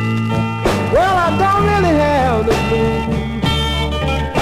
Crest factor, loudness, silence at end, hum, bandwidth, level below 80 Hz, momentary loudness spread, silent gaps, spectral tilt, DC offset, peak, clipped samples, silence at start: 12 dB; -15 LUFS; 0 s; none; 15.5 kHz; -26 dBFS; 5 LU; none; -6 dB/octave; 0.1%; -4 dBFS; under 0.1%; 0 s